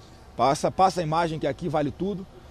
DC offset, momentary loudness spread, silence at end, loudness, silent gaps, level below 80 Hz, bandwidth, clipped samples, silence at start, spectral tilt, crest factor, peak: under 0.1%; 9 LU; 0.05 s; -25 LUFS; none; -50 dBFS; 14 kHz; under 0.1%; 0 s; -5.5 dB/octave; 18 dB; -8 dBFS